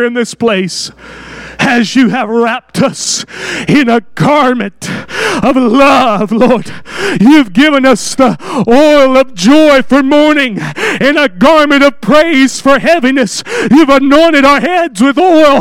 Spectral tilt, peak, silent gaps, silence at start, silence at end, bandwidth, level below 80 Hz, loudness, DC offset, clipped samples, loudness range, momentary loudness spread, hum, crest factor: -4.5 dB/octave; 0 dBFS; none; 0 s; 0 s; 16 kHz; -38 dBFS; -8 LUFS; under 0.1%; 0.9%; 4 LU; 10 LU; none; 8 dB